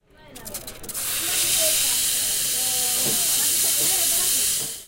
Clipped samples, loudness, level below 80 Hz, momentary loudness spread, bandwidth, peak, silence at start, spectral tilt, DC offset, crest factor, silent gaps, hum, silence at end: under 0.1%; -19 LUFS; -50 dBFS; 15 LU; 17 kHz; -6 dBFS; 0.25 s; 1 dB/octave; under 0.1%; 18 dB; none; none; 0 s